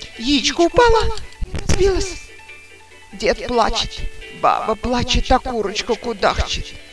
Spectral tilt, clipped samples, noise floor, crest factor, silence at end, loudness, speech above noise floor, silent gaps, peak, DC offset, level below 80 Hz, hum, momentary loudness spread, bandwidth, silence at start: -4 dB/octave; under 0.1%; -43 dBFS; 18 dB; 0 s; -18 LUFS; 26 dB; none; 0 dBFS; 0.4%; -28 dBFS; none; 16 LU; 11 kHz; 0 s